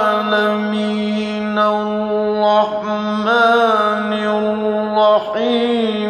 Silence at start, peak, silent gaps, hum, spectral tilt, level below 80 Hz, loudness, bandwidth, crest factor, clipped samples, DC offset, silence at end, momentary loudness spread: 0 s; -2 dBFS; none; none; -6 dB/octave; -58 dBFS; -16 LUFS; 9.6 kHz; 14 dB; under 0.1%; under 0.1%; 0 s; 6 LU